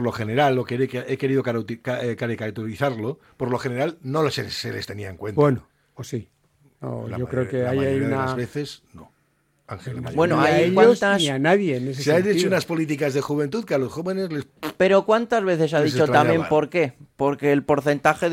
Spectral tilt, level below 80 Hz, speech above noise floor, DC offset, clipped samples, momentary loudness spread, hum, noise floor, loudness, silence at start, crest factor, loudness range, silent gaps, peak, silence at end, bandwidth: -6 dB/octave; -58 dBFS; 44 dB; under 0.1%; under 0.1%; 14 LU; none; -66 dBFS; -22 LUFS; 0 s; 20 dB; 7 LU; none; -2 dBFS; 0 s; 16 kHz